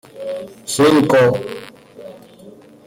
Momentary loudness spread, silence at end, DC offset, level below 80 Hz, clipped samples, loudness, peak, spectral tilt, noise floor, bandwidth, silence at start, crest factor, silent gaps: 26 LU; 0.35 s; under 0.1%; -58 dBFS; under 0.1%; -15 LUFS; -4 dBFS; -5 dB/octave; -42 dBFS; 16.5 kHz; 0.15 s; 14 dB; none